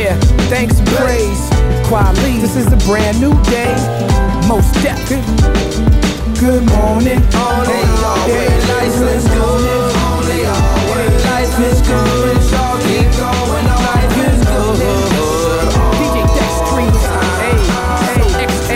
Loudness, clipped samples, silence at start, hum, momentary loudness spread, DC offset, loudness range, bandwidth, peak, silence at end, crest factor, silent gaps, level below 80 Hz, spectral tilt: -13 LUFS; under 0.1%; 0 s; none; 2 LU; under 0.1%; 1 LU; 16.5 kHz; 0 dBFS; 0 s; 12 dB; none; -16 dBFS; -5.5 dB/octave